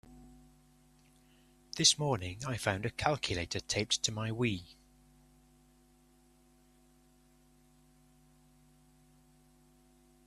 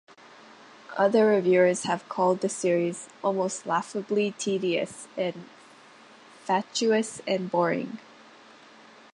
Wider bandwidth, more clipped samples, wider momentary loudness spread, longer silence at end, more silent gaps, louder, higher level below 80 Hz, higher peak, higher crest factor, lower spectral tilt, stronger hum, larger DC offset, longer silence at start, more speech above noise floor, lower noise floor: first, 14 kHz vs 11.5 kHz; neither; about the same, 10 LU vs 11 LU; first, 5.55 s vs 1.15 s; neither; second, -32 LUFS vs -26 LUFS; first, -62 dBFS vs -78 dBFS; about the same, -10 dBFS vs -10 dBFS; first, 30 dB vs 18 dB; second, -3 dB/octave vs -4.5 dB/octave; neither; neither; second, 0.05 s vs 0.9 s; first, 32 dB vs 26 dB; first, -65 dBFS vs -52 dBFS